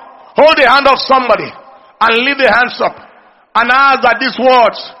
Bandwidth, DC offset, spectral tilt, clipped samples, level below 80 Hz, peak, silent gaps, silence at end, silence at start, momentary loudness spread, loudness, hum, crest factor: 11 kHz; under 0.1%; -4 dB/octave; 0.4%; -48 dBFS; 0 dBFS; none; 0.1 s; 0 s; 9 LU; -10 LUFS; none; 10 dB